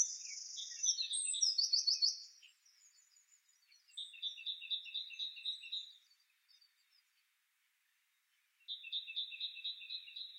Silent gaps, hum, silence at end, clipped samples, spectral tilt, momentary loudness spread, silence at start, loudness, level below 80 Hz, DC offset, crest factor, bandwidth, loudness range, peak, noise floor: none; none; 0 s; under 0.1%; 11 dB/octave; 16 LU; 0 s; -38 LUFS; under -90 dBFS; under 0.1%; 24 dB; 16 kHz; 14 LU; -20 dBFS; -80 dBFS